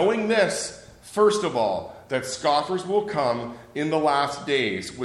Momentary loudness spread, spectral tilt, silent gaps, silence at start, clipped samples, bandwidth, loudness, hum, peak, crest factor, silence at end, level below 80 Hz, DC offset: 10 LU; -4 dB/octave; none; 0 s; under 0.1%; 13 kHz; -24 LUFS; none; -6 dBFS; 16 dB; 0 s; -60 dBFS; under 0.1%